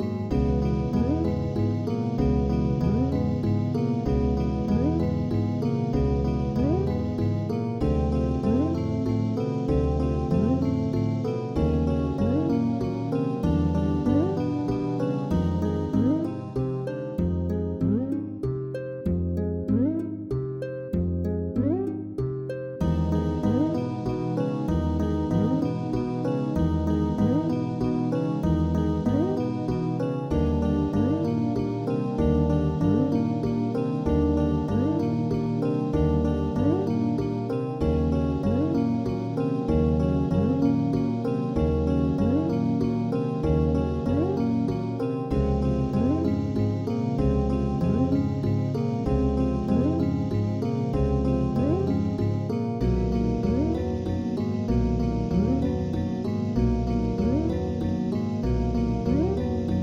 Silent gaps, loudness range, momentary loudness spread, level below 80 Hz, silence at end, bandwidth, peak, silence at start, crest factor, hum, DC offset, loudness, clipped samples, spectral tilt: none; 2 LU; 4 LU; -34 dBFS; 0 s; 7.8 kHz; -10 dBFS; 0 s; 14 dB; none; under 0.1%; -26 LUFS; under 0.1%; -9.5 dB/octave